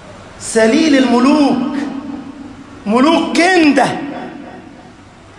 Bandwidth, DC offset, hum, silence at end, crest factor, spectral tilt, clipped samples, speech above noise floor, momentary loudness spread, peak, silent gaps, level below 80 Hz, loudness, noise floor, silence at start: 11.5 kHz; under 0.1%; none; 0.6 s; 14 dB; -4 dB/octave; under 0.1%; 28 dB; 21 LU; 0 dBFS; none; -50 dBFS; -12 LUFS; -39 dBFS; 0 s